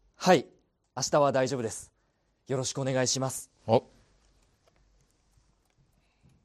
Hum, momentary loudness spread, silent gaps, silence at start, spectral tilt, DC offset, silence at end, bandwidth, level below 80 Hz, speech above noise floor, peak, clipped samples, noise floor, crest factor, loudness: none; 13 LU; none; 0.2 s; -4 dB/octave; under 0.1%; 2.65 s; 14 kHz; -68 dBFS; 45 dB; -10 dBFS; under 0.1%; -72 dBFS; 22 dB; -28 LUFS